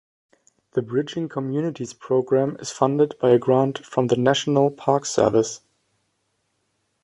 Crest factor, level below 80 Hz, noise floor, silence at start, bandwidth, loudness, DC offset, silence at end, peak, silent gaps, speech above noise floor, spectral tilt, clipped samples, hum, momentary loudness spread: 20 dB; -62 dBFS; -72 dBFS; 0.75 s; 11 kHz; -22 LUFS; under 0.1%; 1.45 s; -4 dBFS; none; 51 dB; -5.5 dB/octave; under 0.1%; none; 10 LU